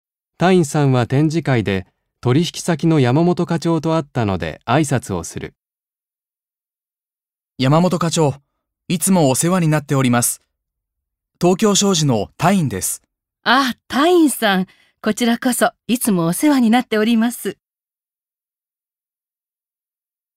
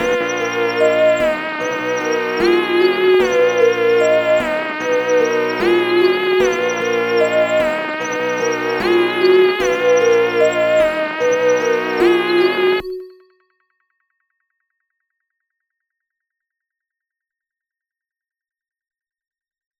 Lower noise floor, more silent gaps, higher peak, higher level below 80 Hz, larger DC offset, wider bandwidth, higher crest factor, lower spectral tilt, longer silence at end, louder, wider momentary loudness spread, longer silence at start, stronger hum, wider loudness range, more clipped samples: about the same, under -90 dBFS vs -89 dBFS; neither; about the same, 0 dBFS vs -2 dBFS; about the same, -54 dBFS vs -52 dBFS; neither; about the same, 16 kHz vs 17 kHz; about the same, 18 dB vs 14 dB; about the same, -5 dB/octave vs -4 dB/octave; second, 2.85 s vs 6.7 s; about the same, -17 LUFS vs -15 LUFS; first, 10 LU vs 6 LU; first, 0.4 s vs 0 s; neither; about the same, 6 LU vs 4 LU; neither